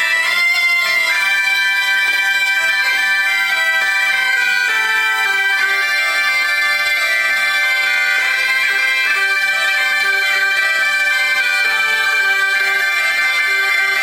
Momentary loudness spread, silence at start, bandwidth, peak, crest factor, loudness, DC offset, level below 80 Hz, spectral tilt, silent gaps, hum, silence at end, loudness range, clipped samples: 1 LU; 0 s; 17.5 kHz; -2 dBFS; 12 dB; -13 LUFS; under 0.1%; -64 dBFS; 2 dB/octave; none; none; 0 s; 0 LU; under 0.1%